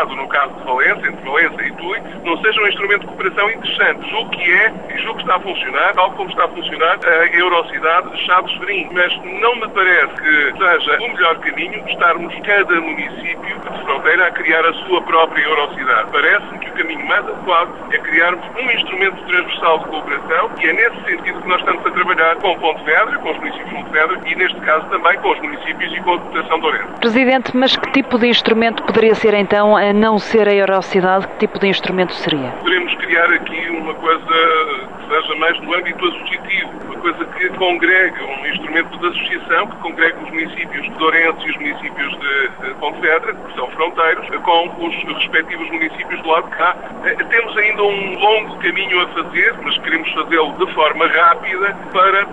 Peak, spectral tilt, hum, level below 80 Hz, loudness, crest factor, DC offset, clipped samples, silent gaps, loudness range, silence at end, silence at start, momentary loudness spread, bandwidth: 0 dBFS; -5 dB/octave; none; -52 dBFS; -15 LUFS; 16 dB; 1%; under 0.1%; none; 3 LU; 0 s; 0 s; 9 LU; 10 kHz